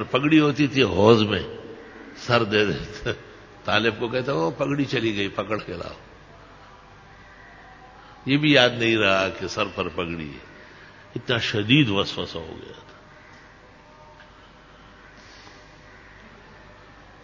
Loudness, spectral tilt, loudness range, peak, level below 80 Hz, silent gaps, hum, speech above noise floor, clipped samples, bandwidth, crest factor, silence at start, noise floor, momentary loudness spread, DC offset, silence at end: -22 LUFS; -5.5 dB/octave; 8 LU; 0 dBFS; -50 dBFS; none; none; 27 dB; under 0.1%; 7.6 kHz; 24 dB; 0 s; -49 dBFS; 21 LU; under 0.1%; 0.55 s